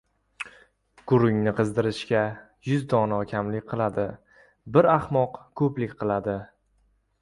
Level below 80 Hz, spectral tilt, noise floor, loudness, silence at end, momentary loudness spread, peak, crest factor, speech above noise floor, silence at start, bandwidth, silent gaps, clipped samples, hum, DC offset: -56 dBFS; -8 dB/octave; -67 dBFS; -25 LUFS; 0.75 s; 15 LU; -6 dBFS; 20 dB; 43 dB; 0.4 s; 11.5 kHz; none; under 0.1%; none; under 0.1%